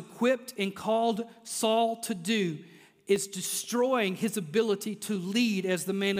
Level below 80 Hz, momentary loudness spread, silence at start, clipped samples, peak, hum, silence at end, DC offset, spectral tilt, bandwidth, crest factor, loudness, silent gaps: -78 dBFS; 7 LU; 0 s; under 0.1%; -12 dBFS; none; 0 s; under 0.1%; -4 dB/octave; 16 kHz; 18 dB; -29 LUFS; none